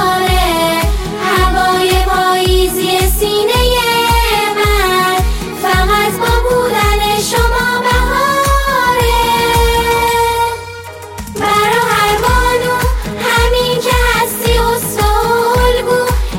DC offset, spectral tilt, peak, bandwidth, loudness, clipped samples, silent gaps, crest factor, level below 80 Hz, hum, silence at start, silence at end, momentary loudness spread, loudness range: under 0.1%; -4 dB/octave; 0 dBFS; 17 kHz; -12 LUFS; under 0.1%; none; 12 dB; -20 dBFS; none; 0 s; 0 s; 4 LU; 1 LU